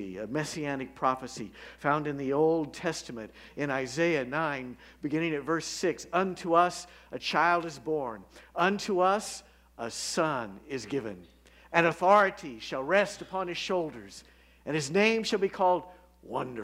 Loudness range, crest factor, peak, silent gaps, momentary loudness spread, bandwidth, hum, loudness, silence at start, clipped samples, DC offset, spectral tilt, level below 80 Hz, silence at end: 3 LU; 24 dB; -6 dBFS; none; 16 LU; 16 kHz; none; -29 LUFS; 0 s; under 0.1%; under 0.1%; -4.5 dB/octave; -62 dBFS; 0 s